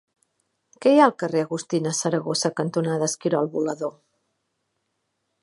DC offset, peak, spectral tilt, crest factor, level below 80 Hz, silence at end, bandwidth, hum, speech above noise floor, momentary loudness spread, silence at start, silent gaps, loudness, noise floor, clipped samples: under 0.1%; -2 dBFS; -4.5 dB/octave; 22 dB; -74 dBFS; 1.55 s; 11.5 kHz; none; 54 dB; 9 LU; 0.8 s; none; -23 LUFS; -76 dBFS; under 0.1%